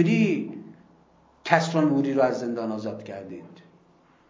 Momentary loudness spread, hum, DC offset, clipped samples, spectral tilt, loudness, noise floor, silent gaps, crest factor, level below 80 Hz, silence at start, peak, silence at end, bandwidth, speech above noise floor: 18 LU; none; under 0.1%; under 0.1%; -6.5 dB/octave; -24 LUFS; -59 dBFS; none; 24 dB; -72 dBFS; 0 s; -2 dBFS; 0.75 s; 7.6 kHz; 35 dB